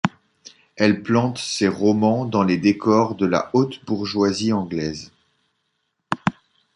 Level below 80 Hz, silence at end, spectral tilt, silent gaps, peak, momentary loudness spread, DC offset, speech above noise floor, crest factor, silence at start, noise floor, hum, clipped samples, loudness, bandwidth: -54 dBFS; 0.45 s; -6 dB/octave; none; -2 dBFS; 9 LU; under 0.1%; 54 dB; 20 dB; 0.05 s; -73 dBFS; none; under 0.1%; -21 LUFS; 11 kHz